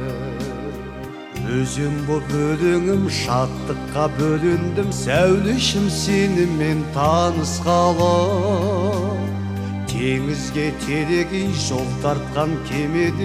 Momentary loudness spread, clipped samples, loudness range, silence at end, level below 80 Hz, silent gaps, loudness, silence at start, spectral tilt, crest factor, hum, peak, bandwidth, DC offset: 9 LU; under 0.1%; 4 LU; 0 s; -38 dBFS; none; -20 LUFS; 0 s; -5.5 dB/octave; 16 dB; none; -4 dBFS; 15.5 kHz; under 0.1%